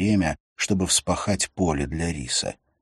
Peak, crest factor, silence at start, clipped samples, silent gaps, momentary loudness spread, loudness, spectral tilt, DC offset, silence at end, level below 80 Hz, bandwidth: -6 dBFS; 20 dB; 0 s; under 0.1%; 0.40-0.56 s; 7 LU; -24 LUFS; -4 dB/octave; under 0.1%; 0.3 s; -42 dBFS; 13 kHz